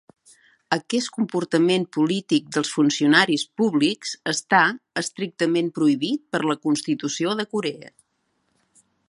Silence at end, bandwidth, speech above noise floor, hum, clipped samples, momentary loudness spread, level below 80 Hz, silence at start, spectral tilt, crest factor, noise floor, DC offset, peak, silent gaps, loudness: 1.2 s; 11.5 kHz; 49 dB; none; under 0.1%; 9 LU; -70 dBFS; 0.7 s; -4 dB/octave; 22 dB; -71 dBFS; under 0.1%; -2 dBFS; none; -22 LUFS